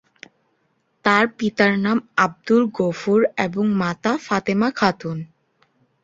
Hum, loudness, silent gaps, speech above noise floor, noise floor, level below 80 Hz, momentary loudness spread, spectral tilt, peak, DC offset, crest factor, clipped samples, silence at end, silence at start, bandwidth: none; -20 LUFS; none; 48 dB; -67 dBFS; -60 dBFS; 6 LU; -6 dB/octave; 0 dBFS; under 0.1%; 20 dB; under 0.1%; 0.8 s; 1.05 s; 7.8 kHz